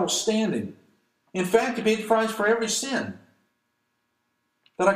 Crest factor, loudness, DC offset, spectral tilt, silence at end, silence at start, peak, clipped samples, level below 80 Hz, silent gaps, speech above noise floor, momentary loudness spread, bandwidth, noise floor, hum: 20 dB; -24 LUFS; under 0.1%; -3.5 dB/octave; 0 s; 0 s; -6 dBFS; under 0.1%; -68 dBFS; none; 51 dB; 10 LU; 15.5 kHz; -75 dBFS; none